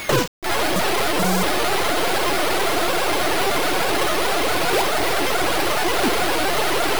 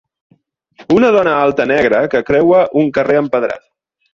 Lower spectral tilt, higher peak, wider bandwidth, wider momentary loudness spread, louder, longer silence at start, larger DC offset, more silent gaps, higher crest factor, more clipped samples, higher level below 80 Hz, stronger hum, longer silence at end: second, -3 dB/octave vs -7 dB/octave; second, -8 dBFS vs -2 dBFS; first, over 20 kHz vs 7.4 kHz; second, 1 LU vs 6 LU; second, -20 LUFS vs -13 LUFS; second, 0 s vs 0.8 s; first, 6% vs under 0.1%; first, 0.28-0.42 s vs none; about the same, 14 dB vs 12 dB; neither; first, -42 dBFS vs -48 dBFS; neither; second, 0 s vs 0.55 s